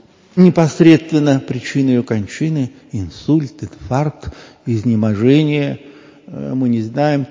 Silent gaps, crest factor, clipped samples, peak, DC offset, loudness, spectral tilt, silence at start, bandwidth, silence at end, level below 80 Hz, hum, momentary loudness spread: none; 16 dB; 0.2%; 0 dBFS; under 0.1%; -15 LUFS; -7.5 dB/octave; 0.35 s; 7.6 kHz; 0.05 s; -44 dBFS; none; 17 LU